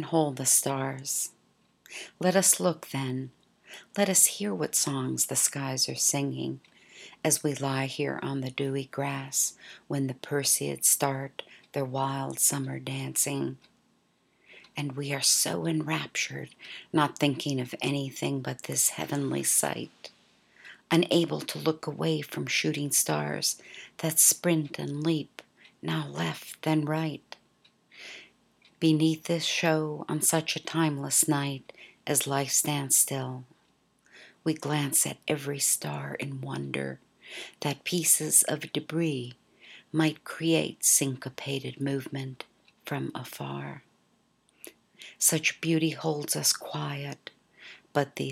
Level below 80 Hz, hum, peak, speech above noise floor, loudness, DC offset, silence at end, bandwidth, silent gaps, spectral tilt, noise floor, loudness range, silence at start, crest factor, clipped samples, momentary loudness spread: -76 dBFS; none; -6 dBFS; 40 dB; -27 LUFS; under 0.1%; 0 s; 17.5 kHz; none; -3 dB/octave; -69 dBFS; 5 LU; 0 s; 24 dB; under 0.1%; 16 LU